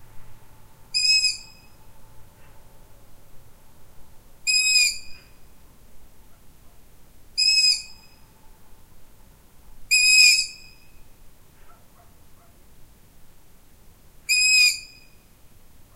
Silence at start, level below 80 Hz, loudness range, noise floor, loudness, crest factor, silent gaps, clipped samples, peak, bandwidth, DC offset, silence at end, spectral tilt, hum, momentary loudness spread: 0 s; -52 dBFS; 5 LU; -50 dBFS; -17 LUFS; 24 dB; none; under 0.1%; -2 dBFS; 16 kHz; under 0.1%; 1.1 s; 3 dB/octave; none; 18 LU